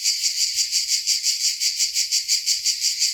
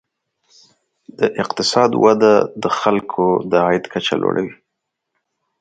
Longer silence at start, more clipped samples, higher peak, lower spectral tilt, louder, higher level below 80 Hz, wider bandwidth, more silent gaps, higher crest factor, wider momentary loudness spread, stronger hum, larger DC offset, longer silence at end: second, 0 s vs 1.2 s; neither; second, -6 dBFS vs 0 dBFS; second, 6.5 dB/octave vs -5 dB/octave; second, -19 LUFS vs -16 LUFS; second, -68 dBFS vs -60 dBFS; first, over 20 kHz vs 9.2 kHz; neither; about the same, 16 dB vs 18 dB; second, 1 LU vs 8 LU; neither; neither; second, 0 s vs 1.05 s